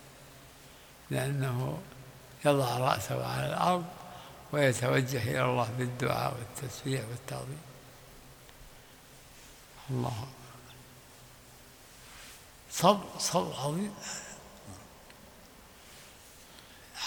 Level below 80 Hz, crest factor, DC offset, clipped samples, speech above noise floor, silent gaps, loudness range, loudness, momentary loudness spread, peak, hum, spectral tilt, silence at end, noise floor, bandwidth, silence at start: -62 dBFS; 26 dB; under 0.1%; under 0.1%; 23 dB; none; 12 LU; -32 LUFS; 24 LU; -8 dBFS; none; -5 dB/octave; 0 s; -54 dBFS; over 20 kHz; 0 s